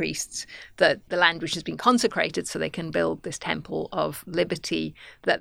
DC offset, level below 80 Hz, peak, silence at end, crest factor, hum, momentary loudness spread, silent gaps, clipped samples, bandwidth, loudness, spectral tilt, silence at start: under 0.1%; -58 dBFS; -2 dBFS; 0 s; 24 dB; none; 9 LU; none; under 0.1%; 17.5 kHz; -26 LUFS; -3.5 dB/octave; 0 s